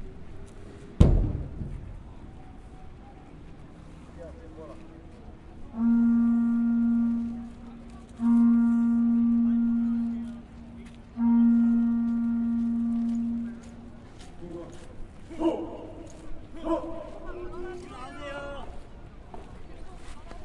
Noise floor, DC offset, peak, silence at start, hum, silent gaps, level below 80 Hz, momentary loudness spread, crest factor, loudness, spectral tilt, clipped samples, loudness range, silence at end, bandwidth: -46 dBFS; under 0.1%; -4 dBFS; 0 s; none; none; -40 dBFS; 25 LU; 24 dB; -26 LUFS; -9 dB/octave; under 0.1%; 17 LU; 0 s; 7.2 kHz